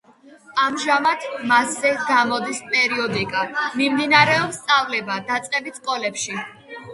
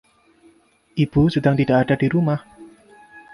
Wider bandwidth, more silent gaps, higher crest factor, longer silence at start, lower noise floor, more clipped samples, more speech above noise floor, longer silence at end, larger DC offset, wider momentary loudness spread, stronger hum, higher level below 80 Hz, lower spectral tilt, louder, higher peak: about the same, 11.5 kHz vs 11.5 kHz; neither; about the same, 20 dB vs 16 dB; second, 0.25 s vs 0.95 s; second, -48 dBFS vs -56 dBFS; neither; second, 27 dB vs 38 dB; second, 0 s vs 0.15 s; neither; about the same, 10 LU vs 8 LU; neither; second, -62 dBFS vs -46 dBFS; second, -3 dB/octave vs -9 dB/octave; about the same, -20 LUFS vs -19 LUFS; first, 0 dBFS vs -4 dBFS